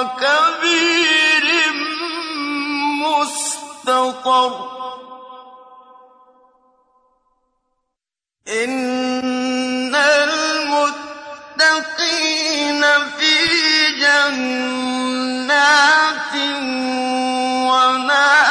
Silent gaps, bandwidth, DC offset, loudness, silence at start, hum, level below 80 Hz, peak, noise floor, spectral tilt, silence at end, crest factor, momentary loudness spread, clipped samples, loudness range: none; 11 kHz; under 0.1%; -15 LUFS; 0 s; none; -64 dBFS; -4 dBFS; -85 dBFS; -0.5 dB/octave; 0 s; 14 dB; 10 LU; under 0.1%; 10 LU